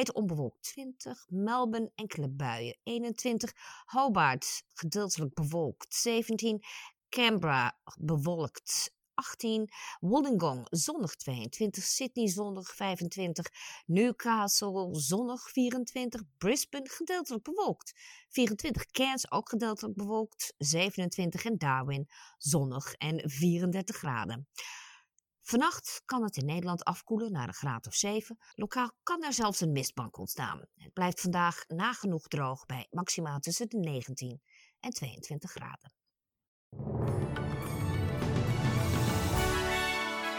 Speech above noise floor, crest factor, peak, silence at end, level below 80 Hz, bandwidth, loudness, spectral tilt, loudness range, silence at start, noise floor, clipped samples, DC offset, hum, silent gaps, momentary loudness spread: 55 dB; 20 dB; -14 dBFS; 0 s; -54 dBFS; 18 kHz; -33 LUFS; -4 dB/octave; 4 LU; 0 s; -88 dBFS; under 0.1%; under 0.1%; none; 36.48-36.71 s; 11 LU